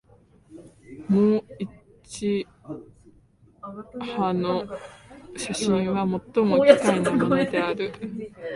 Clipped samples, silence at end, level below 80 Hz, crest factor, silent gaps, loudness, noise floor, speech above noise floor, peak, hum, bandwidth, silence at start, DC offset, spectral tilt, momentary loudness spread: under 0.1%; 0 s; -58 dBFS; 24 dB; none; -23 LUFS; -57 dBFS; 34 dB; 0 dBFS; none; 11.5 kHz; 0.5 s; under 0.1%; -6 dB/octave; 22 LU